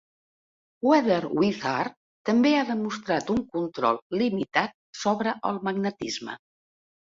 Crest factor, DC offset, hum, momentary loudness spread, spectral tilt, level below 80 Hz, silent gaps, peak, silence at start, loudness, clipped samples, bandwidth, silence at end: 20 dB; under 0.1%; none; 11 LU; -5.5 dB/octave; -64 dBFS; 1.97-2.25 s, 4.02-4.10 s, 4.74-4.93 s; -6 dBFS; 0.85 s; -26 LUFS; under 0.1%; 7.8 kHz; 0.65 s